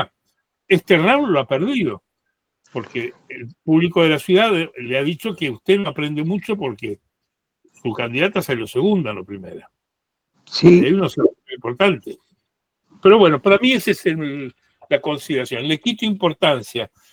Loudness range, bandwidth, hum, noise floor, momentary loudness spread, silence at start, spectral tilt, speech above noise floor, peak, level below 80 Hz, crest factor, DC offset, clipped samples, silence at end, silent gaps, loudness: 6 LU; 19.5 kHz; none; -79 dBFS; 17 LU; 0 s; -6 dB/octave; 62 dB; 0 dBFS; -60 dBFS; 18 dB; under 0.1%; under 0.1%; 0.25 s; none; -18 LUFS